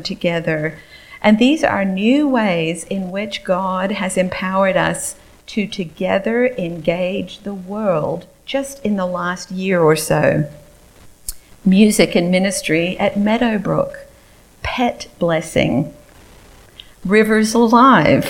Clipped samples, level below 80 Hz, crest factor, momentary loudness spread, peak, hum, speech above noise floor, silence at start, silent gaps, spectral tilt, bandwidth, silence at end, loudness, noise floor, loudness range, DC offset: under 0.1%; -44 dBFS; 16 dB; 13 LU; 0 dBFS; none; 31 dB; 0 s; none; -5 dB/octave; 16.5 kHz; 0 s; -17 LUFS; -47 dBFS; 4 LU; under 0.1%